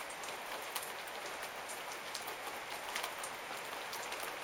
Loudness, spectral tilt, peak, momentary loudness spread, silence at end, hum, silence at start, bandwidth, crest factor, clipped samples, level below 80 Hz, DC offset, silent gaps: -42 LUFS; -0.5 dB/octave; -20 dBFS; 3 LU; 0 s; none; 0 s; 18 kHz; 22 dB; under 0.1%; -76 dBFS; under 0.1%; none